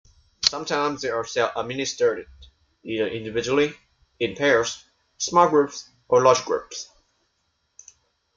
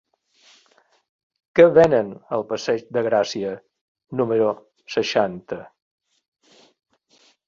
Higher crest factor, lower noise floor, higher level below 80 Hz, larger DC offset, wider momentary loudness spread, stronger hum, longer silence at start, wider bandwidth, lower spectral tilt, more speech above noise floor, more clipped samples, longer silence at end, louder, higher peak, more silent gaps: about the same, 22 dB vs 22 dB; first, -72 dBFS vs -60 dBFS; about the same, -58 dBFS vs -60 dBFS; neither; second, 16 LU vs 19 LU; neither; second, 0.4 s vs 1.55 s; about the same, 7.6 kHz vs 7.4 kHz; second, -3 dB/octave vs -5.5 dB/octave; first, 49 dB vs 41 dB; neither; second, 1.5 s vs 1.8 s; second, -23 LUFS vs -20 LUFS; about the same, -2 dBFS vs -2 dBFS; second, none vs 3.81-3.95 s